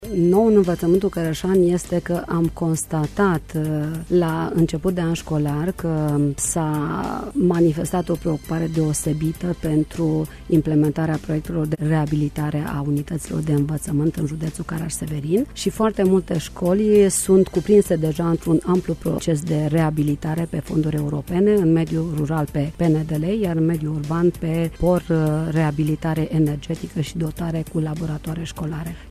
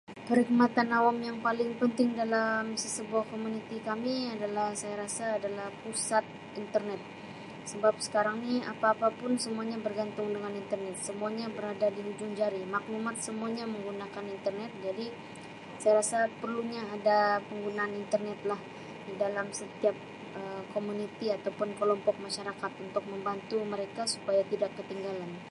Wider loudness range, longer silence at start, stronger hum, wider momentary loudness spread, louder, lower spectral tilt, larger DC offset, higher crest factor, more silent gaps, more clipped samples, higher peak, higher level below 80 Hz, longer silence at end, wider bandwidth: about the same, 4 LU vs 4 LU; about the same, 0 s vs 0.1 s; neither; second, 9 LU vs 12 LU; first, -21 LUFS vs -32 LUFS; first, -7 dB/octave vs -4 dB/octave; neither; about the same, 16 dB vs 20 dB; neither; neither; first, -4 dBFS vs -12 dBFS; first, -40 dBFS vs -76 dBFS; about the same, 0 s vs 0 s; first, 14 kHz vs 11.5 kHz